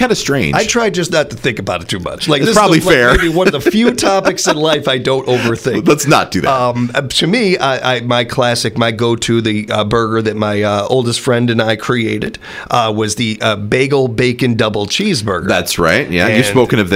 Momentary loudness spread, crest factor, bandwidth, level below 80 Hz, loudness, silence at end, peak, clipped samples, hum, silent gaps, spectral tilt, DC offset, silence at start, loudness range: 6 LU; 12 dB; 16 kHz; -36 dBFS; -13 LUFS; 0 s; 0 dBFS; under 0.1%; none; none; -4.5 dB/octave; under 0.1%; 0 s; 3 LU